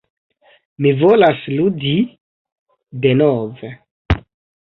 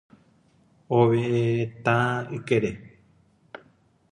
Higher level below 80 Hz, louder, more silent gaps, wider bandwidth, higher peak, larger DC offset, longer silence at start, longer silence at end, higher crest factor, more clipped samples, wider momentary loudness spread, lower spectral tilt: first, -36 dBFS vs -60 dBFS; first, -16 LUFS vs -24 LUFS; first, 2.20-2.45 s, 2.52-2.66 s, 3.91-4.05 s vs none; second, 5.6 kHz vs 10.5 kHz; first, -2 dBFS vs -6 dBFS; neither; about the same, 0.8 s vs 0.9 s; about the same, 0.5 s vs 0.55 s; about the same, 16 dB vs 20 dB; neither; second, 16 LU vs 24 LU; first, -9.5 dB/octave vs -7.5 dB/octave